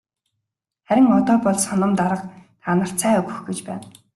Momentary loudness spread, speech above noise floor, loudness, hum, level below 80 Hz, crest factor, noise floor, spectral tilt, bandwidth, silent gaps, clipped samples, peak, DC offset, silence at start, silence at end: 17 LU; 61 dB; -19 LUFS; none; -60 dBFS; 16 dB; -80 dBFS; -5.5 dB/octave; 12.5 kHz; none; under 0.1%; -4 dBFS; under 0.1%; 0.9 s; 0.25 s